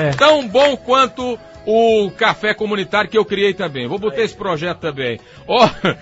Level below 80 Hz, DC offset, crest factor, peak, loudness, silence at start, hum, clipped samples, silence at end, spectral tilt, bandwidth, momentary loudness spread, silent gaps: -48 dBFS; under 0.1%; 16 dB; 0 dBFS; -16 LUFS; 0 s; none; under 0.1%; 0.05 s; -5 dB/octave; 8 kHz; 10 LU; none